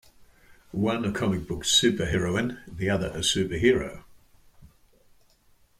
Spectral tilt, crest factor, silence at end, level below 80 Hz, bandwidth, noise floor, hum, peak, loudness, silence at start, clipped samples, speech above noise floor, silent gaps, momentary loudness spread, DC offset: -4 dB/octave; 22 dB; 1.15 s; -48 dBFS; 16 kHz; -61 dBFS; none; -6 dBFS; -25 LUFS; 0.2 s; under 0.1%; 35 dB; none; 10 LU; under 0.1%